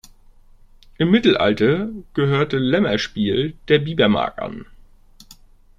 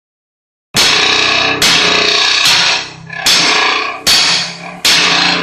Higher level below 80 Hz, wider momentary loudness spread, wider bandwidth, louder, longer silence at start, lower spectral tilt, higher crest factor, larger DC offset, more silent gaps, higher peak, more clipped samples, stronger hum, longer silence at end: about the same, -46 dBFS vs -46 dBFS; first, 10 LU vs 7 LU; second, 7.4 kHz vs over 20 kHz; second, -19 LUFS vs -9 LUFS; first, 1 s vs 0.75 s; first, -6.5 dB/octave vs -0.5 dB/octave; first, 18 dB vs 12 dB; neither; neither; about the same, -2 dBFS vs 0 dBFS; neither; neither; first, 0.45 s vs 0 s